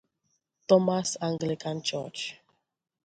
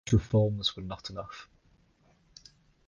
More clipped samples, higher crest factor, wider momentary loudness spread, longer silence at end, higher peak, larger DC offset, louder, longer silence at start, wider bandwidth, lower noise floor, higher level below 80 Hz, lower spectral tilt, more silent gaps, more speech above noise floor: neither; about the same, 22 dB vs 20 dB; second, 14 LU vs 18 LU; second, 0.7 s vs 1.45 s; first, -8 dBFS vs -12 dBFS; neither; about the same, -28 LUFS vs -30 LUFS; first, 0.7 s vs 0.05 s; first, 9.2 kHz vs 7.4 kHz; first, -77 dBFS vs -66 dBFS; second, -72 dBFS vs -48 dBFS; second, -4.5 dB/octave vs -6.5 dB/octave; neither; first, 50 dB vs 37 dB